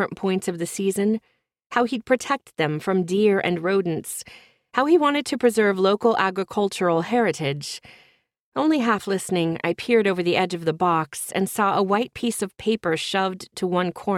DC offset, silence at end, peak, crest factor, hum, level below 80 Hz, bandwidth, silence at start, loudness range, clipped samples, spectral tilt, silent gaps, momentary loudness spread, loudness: under 0.1%; 0 s; -4 dBFS; 18 dB; none; -64 dBFS; 16 kHz; 0 s; 3 LU; under 0.1%; -5 dB/octave; 1.66-1.70 s, 8.41-8.52 s; 8 LU; -22 LUFS